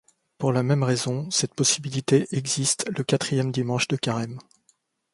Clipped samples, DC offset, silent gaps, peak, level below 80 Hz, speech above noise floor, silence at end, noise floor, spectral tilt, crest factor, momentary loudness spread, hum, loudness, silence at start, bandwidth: under 0.1%; under 0.1%; none; -6 dBFS; -62 dBFS; 43 dB; 0.7 s; -67 dBFS; -4 dB/octave; 18 dB; 6 LU; none; -24 LUFS; 0.4 s; 11.5 kHz